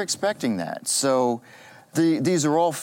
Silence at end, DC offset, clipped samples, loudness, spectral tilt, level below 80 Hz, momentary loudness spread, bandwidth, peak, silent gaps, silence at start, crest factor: 0 s; under 0.1%; under 0.1%; -23 LUFS; -4 dB/octave; -74 dBFS; 7 LU; 17 kHz; -10 dBFS; none; 0 s; 14 dB